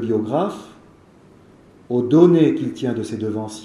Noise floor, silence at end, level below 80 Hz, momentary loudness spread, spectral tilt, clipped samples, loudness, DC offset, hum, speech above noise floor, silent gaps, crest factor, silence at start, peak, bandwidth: -49 dBFS; 0 s; -62 dBFS; 13 LU; -8 dB/octave; under 0.1%; -18 LUFS; under 0.1%; none; 31 dB; none; 20 dB; 0 s; 0 dBFS; 11.5 kHz